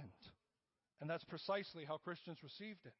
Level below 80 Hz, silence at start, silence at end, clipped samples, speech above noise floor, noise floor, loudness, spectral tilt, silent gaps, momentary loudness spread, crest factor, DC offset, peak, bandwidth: -86 dBFS; 0 s; 0.05 s; under 0.1%; over 42 dB; under -90 dBFS; -48 LUFS; -3.5 dB/octave; none; 15 LU; 20 dB; under 0.1%; -28 dBFS; 5.6 kHz